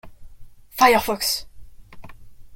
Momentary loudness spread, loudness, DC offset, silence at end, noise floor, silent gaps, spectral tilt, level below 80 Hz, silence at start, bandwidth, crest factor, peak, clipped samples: 12 LU; -19 LUFS; under 0.1%; 0 s; -40 dBFS; none; -2 dB/octave; -46 dBFS; 0.05 s; 17 kHz; 22 dB; -2 dBFS; under 0.1%